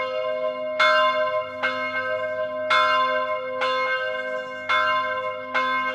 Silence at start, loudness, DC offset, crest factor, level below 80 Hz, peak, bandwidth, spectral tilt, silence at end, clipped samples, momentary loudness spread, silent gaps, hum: 0 s; -23 LUFS; under 0.1%; 18 dB; -72 dBFS; -6 dBFS; 11 kHz; -2.5 dB/octave; 0 s; under 0.1%; 8 LU; none; none